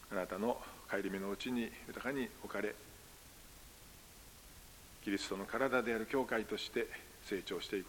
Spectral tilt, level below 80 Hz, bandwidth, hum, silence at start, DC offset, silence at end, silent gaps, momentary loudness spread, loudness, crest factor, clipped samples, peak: -4 dB/octave; -64 dBFS; 17 kHz; none; 0 s; under 0.1%; 0 s; none; 20 LU; -40 LUFS; 22 dB; under 0.1%; -20 dBFS